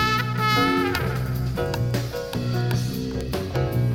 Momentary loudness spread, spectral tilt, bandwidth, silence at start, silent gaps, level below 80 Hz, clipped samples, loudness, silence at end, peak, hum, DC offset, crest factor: 8 LU; -6 dB/octave; 17 kHz; 0 s; none; -38 dBFS; under 0.1%; -24 LUFS; 0 s; -6 dBFS; none; under 0.1%; 16 dB